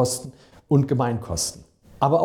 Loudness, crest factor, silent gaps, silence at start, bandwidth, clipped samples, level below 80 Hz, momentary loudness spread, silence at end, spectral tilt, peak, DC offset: -24 LUFS; 16 dB; none; 0 s; 16.5 kHz; under 0.1%; -50 dBFS; 9 LU; 0 s; -5.5 dB/octave; -6 dBFS; under 0.1%